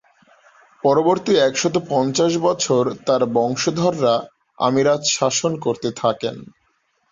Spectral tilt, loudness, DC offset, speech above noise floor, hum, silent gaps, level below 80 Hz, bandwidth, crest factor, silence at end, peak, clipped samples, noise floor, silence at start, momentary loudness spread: -4 dB/octave; -19 LUFS; under 0.1%; 47 dB; none; none; -60 dBFS; 7.8 kHz; 16 dB; 0.65 s; -4 dBFS; under 0.1%; -65 dBFS; 0.85 s; 6 LU